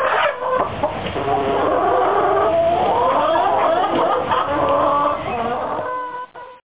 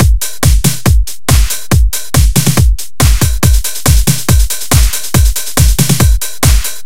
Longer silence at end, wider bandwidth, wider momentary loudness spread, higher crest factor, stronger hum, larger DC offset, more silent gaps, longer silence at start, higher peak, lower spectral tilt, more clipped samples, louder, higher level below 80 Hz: about the same, 0.05 s vs 0.05 s; second, 4 kHz vs 17.5 kHz; first, 7 LU vs 3 LU; about the same, 14 dB vs 10 dB; neither; second, 0.6% vs 10%; neither; about the same, 0 s vs 0 s; second, -6 dBFS vs 0 dBFS; first, -9 dB/octave vs -4 dB/octave; second, under 0.1% vs 1%; second, -18 LUFS vs -11 LUFS; second, -46 dBFS vs -12 dBFS